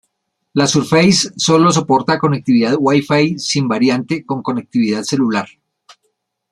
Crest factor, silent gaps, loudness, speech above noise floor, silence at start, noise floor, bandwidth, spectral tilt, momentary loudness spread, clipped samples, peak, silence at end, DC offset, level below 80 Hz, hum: 16 dB; none; -15 LUFS; 56 dB; 0.55 s; -70 dBFS; 12.5 kHz; -4.5 dB/octave; 9 LU; under 0.1%; 0 dBFS; 1.05 s; under 0.1%; -54 dBFS; none